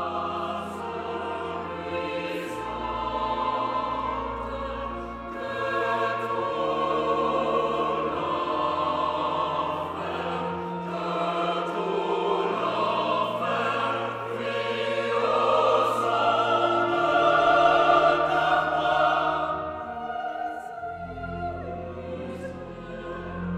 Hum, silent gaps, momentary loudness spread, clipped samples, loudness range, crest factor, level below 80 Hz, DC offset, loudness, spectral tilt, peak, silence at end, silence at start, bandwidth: none; none; 13 LU; under 0.1%; 9 LU; 20 dB; -52 dBFS; under 0.1%; -26 LUFS; -5.5 dB/octave; -6 dBFS; 0 s; 0 s; 13.5 kHz